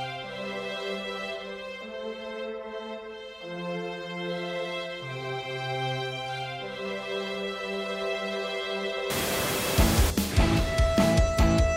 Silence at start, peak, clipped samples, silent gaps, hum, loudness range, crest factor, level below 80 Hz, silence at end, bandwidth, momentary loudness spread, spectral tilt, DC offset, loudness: 0 s; -8 dBFS; under 0.1%; none; none; 10 LU; 20 dB; -34 dBFS; 0 s; 16 kHz; 13 LU; -4.5 dB/octave; under 0.1%; -29 LUFS